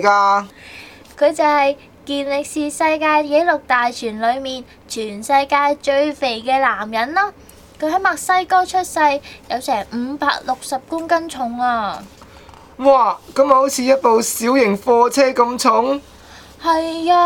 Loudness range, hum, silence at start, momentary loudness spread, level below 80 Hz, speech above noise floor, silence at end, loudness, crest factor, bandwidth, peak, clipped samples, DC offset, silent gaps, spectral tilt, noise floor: 5 LU; none; 0 s; 11 LU; -52 dBFS; 25 dB; 0 s; -17 LUFS; 16 dB; 18.5 kHz; 0 dBFS; under 0.1%; under 0.1%; none; -3 dB/octave; -42 dBFS